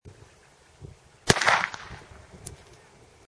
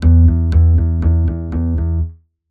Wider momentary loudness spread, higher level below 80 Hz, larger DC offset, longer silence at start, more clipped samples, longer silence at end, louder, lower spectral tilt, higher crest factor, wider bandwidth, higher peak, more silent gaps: first, 28 LU vs 9 LU; second, -50 dBFS vs -16 dBFS; neither; about the same, 0.05 s vs 0 s; neither; first, 0.75 s vs 0.35 s; second, -23 LUFS vs -15 LUFS; second, -2.5 dB/octave vs -11 dB/octave; first, 30 dB vs 12 dB; first, 11 kHz vs 1.8 kHz; about the same, 0 dBFS vs -2 dBFS; neither